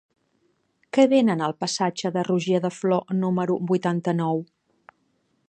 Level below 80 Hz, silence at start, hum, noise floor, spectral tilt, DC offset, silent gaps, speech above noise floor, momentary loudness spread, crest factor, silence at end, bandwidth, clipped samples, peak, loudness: -72 dBFS; 0.95 s; none; -69 dBFS; -6 dB/octave; under 0.1%; none; 47 dB; 7 LU; 20 dB; 1.05 s; 9.2 kHz; under 0.1%; -4 dBFS; -23 LUFS